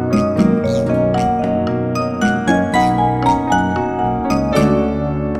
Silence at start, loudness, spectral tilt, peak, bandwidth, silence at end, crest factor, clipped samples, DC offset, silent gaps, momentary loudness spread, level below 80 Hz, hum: 0 s; -16 LUFS; -7 dB/octave; 0 dBFS; 13 kHz; 0 s; 14 dB; under 0.1%; 0.3%; none; 4 LU; -34 dBFS; none